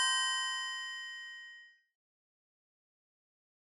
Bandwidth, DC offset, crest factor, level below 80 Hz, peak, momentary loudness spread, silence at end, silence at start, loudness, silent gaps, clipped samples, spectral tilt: 19 kHz; under 0.1%; 20 dB; under -90 dBFS; -20 dBFS; 20 LU; 1.95 s; 0 s; -35 LUFS; none; under 0.1%; 9.5 dB/octave